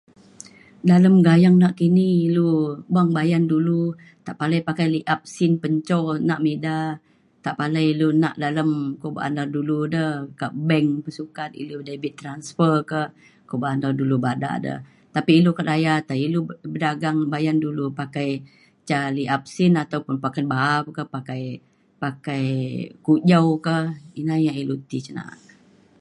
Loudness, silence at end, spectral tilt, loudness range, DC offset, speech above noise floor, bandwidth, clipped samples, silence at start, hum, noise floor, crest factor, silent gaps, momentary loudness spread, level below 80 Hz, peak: -21 LUFS; 0.7 s; -7.5 dB/octave; 7 LU; under 0.1%; 33 dB; 10.5 kHz; under 0.1%; 0.85 s; none; -54 dBFS; 18 dB; none; 14 LU; -66 dBFS; -4 dBFS